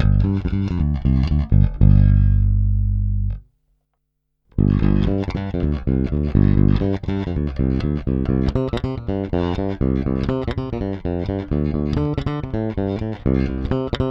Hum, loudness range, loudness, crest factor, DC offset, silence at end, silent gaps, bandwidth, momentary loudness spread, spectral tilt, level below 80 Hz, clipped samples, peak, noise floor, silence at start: none; 5 LU; -20 LUFS; 16 dB; under 0.1%; 0 s; none; 5.8 kHz; 9 LU; -10 dB/octave; -24 dBFS; under 0.1%; -2 dBFS; -73 dBFS; 0 s